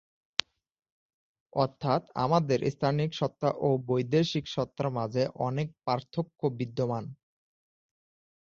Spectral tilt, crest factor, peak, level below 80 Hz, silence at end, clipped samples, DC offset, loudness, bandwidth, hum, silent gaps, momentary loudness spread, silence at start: -6.5 dB/octave; 28 dB; -2 dBFS; -64 dBFS; 1.3 s; under 0.1%; under 0.1%; -30 LUFS; 7.6 kHz; none; none; 6 LU; 1.55 s